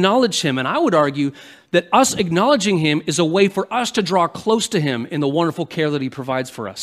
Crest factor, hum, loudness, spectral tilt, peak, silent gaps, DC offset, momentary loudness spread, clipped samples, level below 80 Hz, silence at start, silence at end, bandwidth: 18 dB; none; -18 LUFS; -4.5 dB/octave; 0 dBFS; none; under 0.1%; 8 LU; under 0.1%; -58 dBFS; 0 s; 0 s; 15.5 kHz